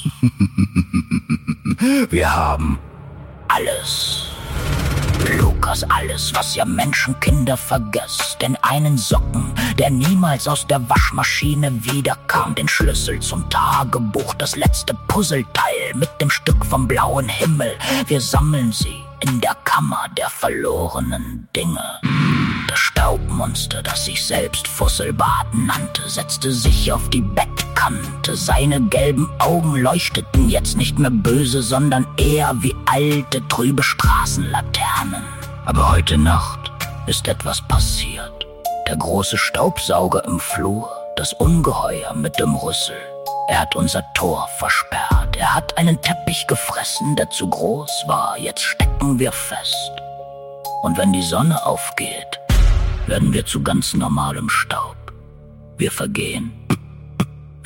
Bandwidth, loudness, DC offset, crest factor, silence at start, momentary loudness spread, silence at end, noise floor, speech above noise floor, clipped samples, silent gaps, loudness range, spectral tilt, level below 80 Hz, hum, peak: 17 kHz; -18 LUFS; under 0.1%; 16 dB; 0 s; 7 LU; 0 s; -40 dBFS; 22 dB; under 0.1%; none; 3 LU; -4.5 dB/octave; -26 dBFS; none; -2 dBFS